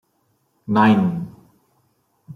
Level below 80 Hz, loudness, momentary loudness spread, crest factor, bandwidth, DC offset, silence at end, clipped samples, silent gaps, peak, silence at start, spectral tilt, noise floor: -62 dBFS; -18 LUFS; 21 LU; 20 dB; 6.2 kHz; under 0.1%; 0 s; under 0.1%; none; -2 dBFS; 0.7 s; -8.5 dB/octave; -66 dBFS